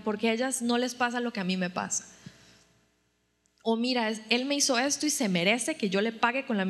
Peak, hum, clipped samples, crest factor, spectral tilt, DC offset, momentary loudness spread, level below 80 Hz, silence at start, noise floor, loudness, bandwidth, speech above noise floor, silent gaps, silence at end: -8 dBFS; none; under 0.1%; 22 dB; -3 dB/octave; under 0.1%; 6 LU; -76 dBFS; 0 s; -73 dBFS; -28 LUFS; 13.5 kHz; 44 dB; none; 0 s